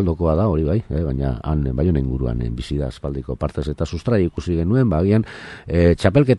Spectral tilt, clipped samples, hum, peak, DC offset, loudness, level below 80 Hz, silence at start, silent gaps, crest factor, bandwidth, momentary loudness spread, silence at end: -8.5 dB/octave; under 0.1%; none; -2 dBFS; under 0.1%; -20 LUFS; -30 dBFS; 0 s; none; 18 dB; 11 kHz; 9 LU; 0 s